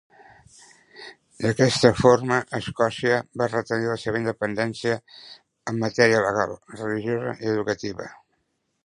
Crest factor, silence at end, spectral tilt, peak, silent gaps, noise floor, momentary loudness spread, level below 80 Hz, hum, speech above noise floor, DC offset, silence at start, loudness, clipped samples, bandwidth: 22 dB; 0.7 s; -5 dB/octave; -2 dBFS; none; -73 dBFS; 19 LU; -56 dBFS; none; 50 dB; under 0.1%; 0.95 s; -23 LUFS; under 0.1%; 11.5 kHz